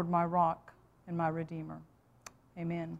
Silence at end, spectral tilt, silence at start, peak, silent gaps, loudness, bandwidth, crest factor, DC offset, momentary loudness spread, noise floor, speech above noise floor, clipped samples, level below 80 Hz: 0 s; -8 dB/octave; 0 s; -16 dBFS; none; -35 LUFS; 8.6 kHz; 20 dB; under 0.1%; 23 LU; -57 dBFS; 23 dB; under 0.1%; -66 dBFS